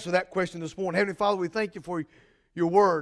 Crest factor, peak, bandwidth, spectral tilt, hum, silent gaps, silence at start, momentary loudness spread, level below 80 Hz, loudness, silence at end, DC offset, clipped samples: 20 dB; -8 dBFS; 11 kHz; -6 dB/octave; none; none; 0 s; 12 LU; -64 dBFS; -27 LUFS; 0 s; under 0.1%; under 0.1%